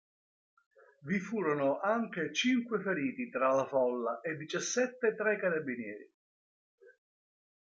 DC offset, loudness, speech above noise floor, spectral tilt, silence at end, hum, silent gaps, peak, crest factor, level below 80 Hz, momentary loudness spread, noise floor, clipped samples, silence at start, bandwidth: under 0.1%; -33 LUFS; over 57 dB; -4 dB/octave; 0.8 s; none; 6.14-6.78 s; -16 dBFS; 18 dB; -82 dBFS; 8 LU; under -90 dBFS; under 0.1%; 1.05 s; 9 kHz